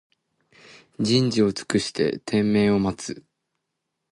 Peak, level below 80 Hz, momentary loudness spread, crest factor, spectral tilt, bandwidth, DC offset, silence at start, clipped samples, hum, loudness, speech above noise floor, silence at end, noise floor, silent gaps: -8 dBFS; -54 dBFS; 12 LU; 16 dB; -5.5 dB/octave; 11.5 kHz; under 0.1%; 1 s; under 0.1%; none; -22 LUFS; 58 dB; 0.95 s; -80 dBFS; none